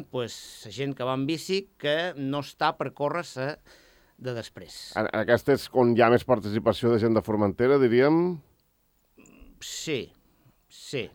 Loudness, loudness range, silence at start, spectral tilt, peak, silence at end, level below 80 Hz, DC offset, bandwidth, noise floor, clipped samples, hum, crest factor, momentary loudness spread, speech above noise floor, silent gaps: -26 LUFS; 8 LU; 0 s; -6 dB/octave; -4 dBFS; 0.05 s; -60 dBFS; under 0.1%; 17.5 kHz; -68 dBFS; under 0.1%; none; 22 dB; 18 LU; 43 dB; none